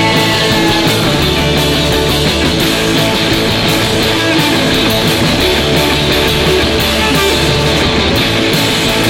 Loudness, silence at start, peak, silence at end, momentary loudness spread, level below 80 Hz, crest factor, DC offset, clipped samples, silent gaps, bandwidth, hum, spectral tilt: -10 LUFS; 0 s; 0 dBFS; 0 s; 1 LU; -24 dBFS; 10 dB; under 0.1%; under 0.1%; none; 16.5 kHz; none; -4 dB/octave